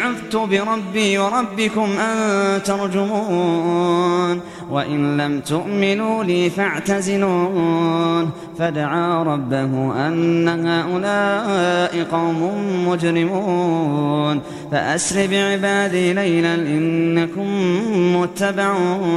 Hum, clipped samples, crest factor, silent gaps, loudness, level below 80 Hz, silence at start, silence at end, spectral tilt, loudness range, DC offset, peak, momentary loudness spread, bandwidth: none; under 0.1%; 16 dB; none; -19 LUFS; -58 dBFS; 0 s; 0 s; -5.5 dB/octave; 1 LU; under 0.1%; -2 dBFS; 4 LU; 13 kHz